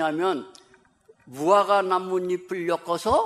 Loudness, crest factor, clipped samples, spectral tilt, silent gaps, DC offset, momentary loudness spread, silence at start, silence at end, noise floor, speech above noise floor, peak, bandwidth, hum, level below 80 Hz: -24 LUFS; 18 dB; under 0.1%; -5 dB/octave; none; under 0.1%; 9 LU; 0 s; 0 s; -58 dBFS; 35 dB; -6 dBFS; 14 kHz; none; -56 dBFS